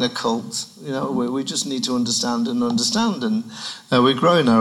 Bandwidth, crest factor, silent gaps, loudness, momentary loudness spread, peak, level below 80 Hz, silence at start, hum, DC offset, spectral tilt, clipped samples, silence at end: 13 kHz; 16 dB; none; -20 LUFS; 12 LU; -4 dBFS; -64 dBFS; 0 s; none; under 0.1%; -4 dB/octave; under 0.1%; 0 s